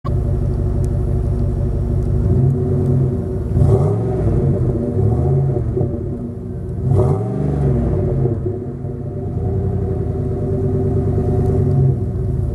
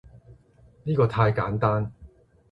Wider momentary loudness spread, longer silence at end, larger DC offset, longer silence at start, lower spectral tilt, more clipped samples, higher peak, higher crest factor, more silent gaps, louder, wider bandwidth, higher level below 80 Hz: second, 8 LU vs 12 LU; second, 0 s vs 0.45 s; neither; about the same, 0.05 s vs 0.15 s; first, -11 dB/octave vs -9.5 dB/octave; neither; first, 0 dBFS vs -8 dBFS; about the same, 16 dB vs 18 dB; neither; first, -18 LUFS vs -24 LUFS; second, 2.7 kHz vs 5.4 kHz; first, -26 dBFS vs -50 dBFS